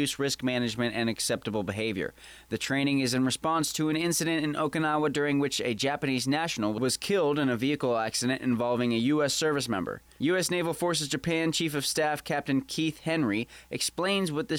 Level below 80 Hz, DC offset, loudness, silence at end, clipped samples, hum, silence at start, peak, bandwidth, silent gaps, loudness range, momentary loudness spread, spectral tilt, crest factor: -62 dBFS; under 0.1%; -28 LUFS; 0 s; under 0.1%; none; 0 s; -18 dBFS; 18.5 kHz; none; 2 LU; 5 LU; -4 dB/octave; 10 dB